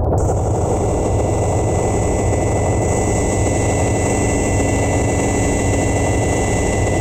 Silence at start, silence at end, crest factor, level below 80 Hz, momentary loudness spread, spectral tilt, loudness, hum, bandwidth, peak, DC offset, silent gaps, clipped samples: 0 s; 0 s; 10 dB; -24 dBFS; 1 LU; -6 dB/octave; -17 LUFS; none; 16 kHz; -6 dBFS; under 0.1%; none; under 0.1%